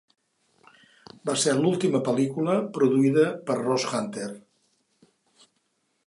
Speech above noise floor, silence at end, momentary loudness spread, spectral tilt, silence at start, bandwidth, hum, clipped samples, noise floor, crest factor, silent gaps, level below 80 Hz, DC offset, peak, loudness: 49 dB; 1.7 s; 13 LU; -5 dB/octave; 1.25 s; 11.5 kHz; none; under 0.1%; -73 dBFS; 18 dB; none; -76 dBFS; under 0.1%; -8 dBFS; -24 LUFS